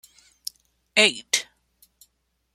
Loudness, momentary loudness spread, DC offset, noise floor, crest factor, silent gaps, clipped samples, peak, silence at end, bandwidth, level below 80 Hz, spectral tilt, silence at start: -21 LUFS; 19 LU; under 0.1%; -71 dBFS; 26 dB; none; under 0.1%; -2 dBFS; 1.1 s; 16.5 kHz; -72 dBFS; 0 dB/octave; 0.95 s